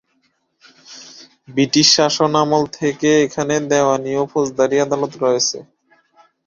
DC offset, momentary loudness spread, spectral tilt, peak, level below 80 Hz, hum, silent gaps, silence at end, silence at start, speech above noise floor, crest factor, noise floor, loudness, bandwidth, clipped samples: under 0.1%; 11 LU; -3.5 dB/octave; 0 dBFS; -58 dBFS; none; none; 0.85 s; 0.9 s; 48 dB; 18 dB; -65 dBFS; -16 LUFS; 7.6 kHz; under 0.1%